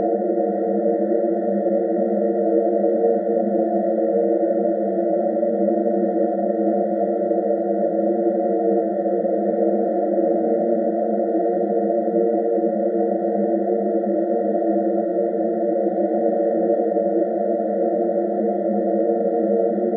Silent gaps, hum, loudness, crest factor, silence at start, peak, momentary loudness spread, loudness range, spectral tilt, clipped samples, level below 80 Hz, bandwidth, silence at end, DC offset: none; none; -20 LUFS; 14 dB; 0 s; -6 dBFS; 2 LU; 1 LU; -14 dB/octave; under 0.1%; -82 dBFS; 2.2 kHz; 0 s; under 0.1%